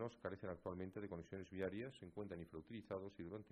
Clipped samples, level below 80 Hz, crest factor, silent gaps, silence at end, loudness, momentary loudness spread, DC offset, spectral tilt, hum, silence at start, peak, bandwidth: under 0.1%; -74 dBFS; 18 dB; none; 0 s; -51 LUFS; 6 LU; under 0.1%; -7.5 dB/octave; none; 0 s; -32 dBFS; 10 kHz